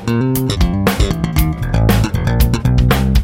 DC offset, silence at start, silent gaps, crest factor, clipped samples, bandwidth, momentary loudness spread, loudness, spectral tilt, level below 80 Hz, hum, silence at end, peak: under 0.1%; 0 s; none; 12 dB; under 0.1%; 16.5 kHz; 3 LU; -15 LUFS; -6 dB/octave; -18 dBFS; none; 0 s; 0 dBFS